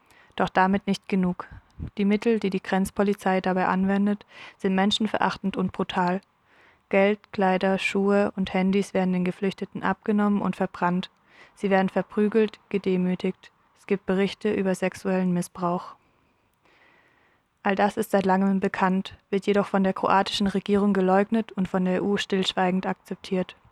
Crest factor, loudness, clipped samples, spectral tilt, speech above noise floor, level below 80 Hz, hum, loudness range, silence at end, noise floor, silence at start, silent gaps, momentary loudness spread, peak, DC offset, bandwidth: 18 dB; -25 LUFS; under 0.1%; -6.5 dB/octave; 42 dB; -56 dBFS; none; 4 LU; 0.2 s; -66 dBFS; 0.35 s; none; 8 LU; -6 dBFS; under 0.1%; 13 kHz